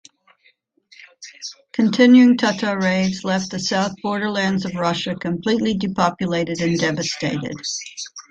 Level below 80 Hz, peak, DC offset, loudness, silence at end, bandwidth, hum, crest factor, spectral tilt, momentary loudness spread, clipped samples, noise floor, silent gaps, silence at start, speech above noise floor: -56 dBFS; -2 dBFS; under 0.1%; -19 LUFS; 0.1 s; 8 kHz; none; 18 dB; -5 dB/octave; 14 LU; under 0.1%; -60 dBFS; none; 1 s; 41 dB